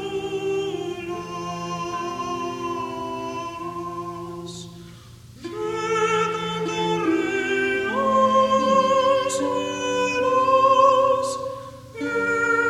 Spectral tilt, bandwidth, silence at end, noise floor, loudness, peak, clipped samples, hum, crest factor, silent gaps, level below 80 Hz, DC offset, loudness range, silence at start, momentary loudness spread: -4 dB/octave; 14 kHz; 0 s; -44 dBFS; -22 LUFS; -4 dBFS; under 0.1%; none; 18 dB; none; -56 dBFS; under 0.1%; 11 LU; 0 s; 15 LU